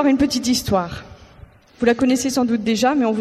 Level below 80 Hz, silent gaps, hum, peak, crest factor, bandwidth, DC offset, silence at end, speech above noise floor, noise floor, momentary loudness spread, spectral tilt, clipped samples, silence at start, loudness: -44 dBFS; none; none; -4 dBFS; 14 dB; 14.5 kHz; under 0.1%; 0 s; 27 dB; -45 dBFS; 5 LU; -4.5 dB/octave; under 0.1%; 0 s; -18 LUFS